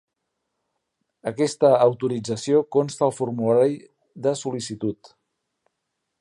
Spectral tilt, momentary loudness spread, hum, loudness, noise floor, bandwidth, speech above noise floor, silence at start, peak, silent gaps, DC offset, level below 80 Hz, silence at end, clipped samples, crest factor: -6 dB/octave; 12 LU; none; -22 LUFS; -79 dBFS; 11.5 kHz; 57 dB; 1.25 s; -4 dBFS; none; under 0.1%; -68 dBFS; 1.25 s; under 0.1%; 20 dB